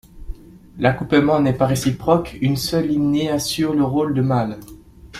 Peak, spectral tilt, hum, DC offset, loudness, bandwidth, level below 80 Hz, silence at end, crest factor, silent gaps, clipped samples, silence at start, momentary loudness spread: -2 dBFS; -6 dB/octave; none; under 0.1%; -19 LUFS; 15.5 kHz; -40 dBFS; 0 s; 18 dB; none; under 0.1%; 0.15 s; 5 LU